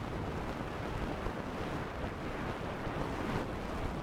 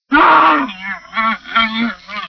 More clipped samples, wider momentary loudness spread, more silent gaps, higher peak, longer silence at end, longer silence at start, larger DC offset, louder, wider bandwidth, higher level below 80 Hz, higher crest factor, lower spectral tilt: neither; second, 3 LU vs 13 LU; neither; second, -20 dBFS vs 0 dBFS; about the same, 0 s vs 0 s; about the same, 0 s vs 0.1 s; neither; second, -39 LUFS vs -13 LUFS; first, 17.5 kHz vs 5.4 kHz; about the same, -46 dBFS vs -46 dBFS; about the same, 18 dB vs 14 dB; first, -6.5 dB/octave vs -4.5 dB/octave